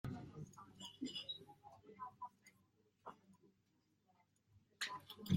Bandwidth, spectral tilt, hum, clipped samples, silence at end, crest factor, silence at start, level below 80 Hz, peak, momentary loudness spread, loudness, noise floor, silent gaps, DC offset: 16 kHz; -5 dB/octave; none; under 0.1%; 0 s; 26 dB; 0.05 s; -76 dBFS; -24 dBFS; 16 LU; -51 LUFS; -80 dBFS; none; under 0.1%